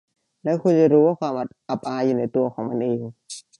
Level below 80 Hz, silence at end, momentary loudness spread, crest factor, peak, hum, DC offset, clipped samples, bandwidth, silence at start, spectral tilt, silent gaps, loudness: -70 dBFS; 0.2 s; 14 LU; 16 dB; -4 dBFS; none; under 0.1%; under 0.1%; 11.5 kHz; 0.45 s; -7.5 dB/octave; none; -22 LUFS